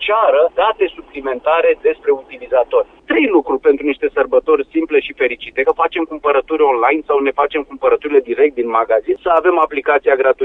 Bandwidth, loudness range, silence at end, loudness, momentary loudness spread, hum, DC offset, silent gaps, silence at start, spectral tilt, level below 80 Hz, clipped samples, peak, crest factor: 4 kHz; 1 LU; 0 s; -15 LUFS; 6 LU; none; under 0.1%; none; 0 s; -6 dB/octave; -50 dBFS; under 0.1%; 0 dBFS; 14 dB